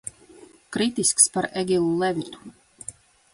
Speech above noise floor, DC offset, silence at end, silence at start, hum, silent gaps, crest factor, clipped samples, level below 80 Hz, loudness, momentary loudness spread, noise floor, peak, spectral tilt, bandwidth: 27 dB; under 0.1%; 0.45 s; 0.4 s; none; none; 22 dB; under 0.1%; -60 dBFS; -22 LUFS; 22 LU; -50 dBFS; -2 dBFS; -3 dB/octave; 11.5 kHz